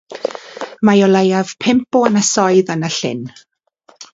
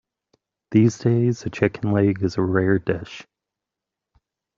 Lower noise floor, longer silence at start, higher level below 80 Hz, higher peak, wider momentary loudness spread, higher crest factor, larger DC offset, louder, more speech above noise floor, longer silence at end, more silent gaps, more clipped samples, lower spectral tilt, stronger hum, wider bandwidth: second, -52 dBFS vs -86 dBFS; second, 0.1 s vs 0.7 s; about the same, -58 dBFS vs -56 dBFS; about the same, 0 dBFS vs -2 dBFS; first, 15 LU vs 9 LU; about the same, 16 dB vs 20 dB; neither; first, -14 LUFS vs -21 LUFS; second, 38 dB vs 66 dB; second, 0.1 s vs 1.35 s; neither; neither; second, -4.5 dB/octave vs -7.5 dB/octave; neither; about the same, 7.8 kHz vs 7.6 kHz